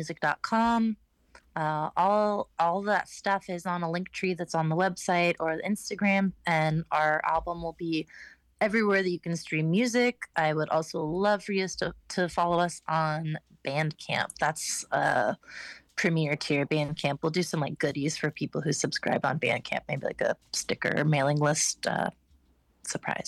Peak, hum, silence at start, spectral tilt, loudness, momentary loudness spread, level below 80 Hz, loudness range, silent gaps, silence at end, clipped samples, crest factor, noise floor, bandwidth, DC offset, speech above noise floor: -10 dBFS; none; 0 s; -4.5 dB/octave; -28 LUFS; 8 LU; -60 dBFS; 2 LU; none; 0 s; under 0.1%; 18 dB; -65 dBFS; 12.5 kHz; under 0.1%; 37 dB